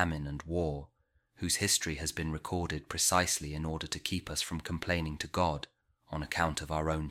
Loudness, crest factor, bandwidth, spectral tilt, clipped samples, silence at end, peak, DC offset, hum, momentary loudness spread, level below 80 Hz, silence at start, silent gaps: -33 LUFS; 22 dB; 16 kHz; -3.5 dB/octave; under 0.1%; 0 s; -12 dBFS; under 0.1%; none; 11 LU; -48 dBFS; 0 s; none